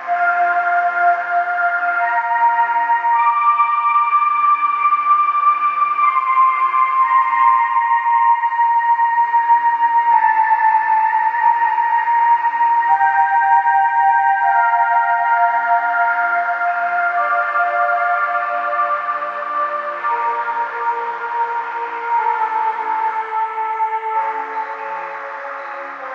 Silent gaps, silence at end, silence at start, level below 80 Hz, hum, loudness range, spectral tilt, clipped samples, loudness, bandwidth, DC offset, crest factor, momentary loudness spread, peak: none; 0 s; 0 s; under -90 dBFS; none; 6 LU; -2.5 dB/octave; under 0.1%; -16 LUFS; 5.6 kHz; under 0.1%; 14 dB; 7 LU; -2 dBFS